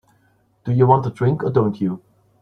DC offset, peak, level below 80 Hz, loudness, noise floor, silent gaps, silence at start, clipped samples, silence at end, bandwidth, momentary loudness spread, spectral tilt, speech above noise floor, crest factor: under 0.1%; -2 dBFS; -54 dBFS; -19 LUFS; -60 dBFS; none; 0.65 s; under 0.1%; 0.45 s; 5.2 kHz; 13 LU; -10.5 dB/octave; 43 dB; 18 dB